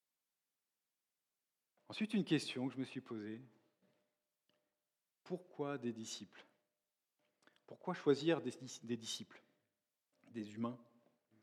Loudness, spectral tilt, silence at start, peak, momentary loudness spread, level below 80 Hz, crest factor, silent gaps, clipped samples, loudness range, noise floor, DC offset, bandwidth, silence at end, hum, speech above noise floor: -42 LUFS; -5 dB/octave; 1.9 s; -22 dBFS; 15 LU; under -90 dBFS; 24 dB; none; under 0.1%; 7 LU; under -90 dBFS; under 0.1%; 13.5 kHz; 0.6 s; none; over 48 dB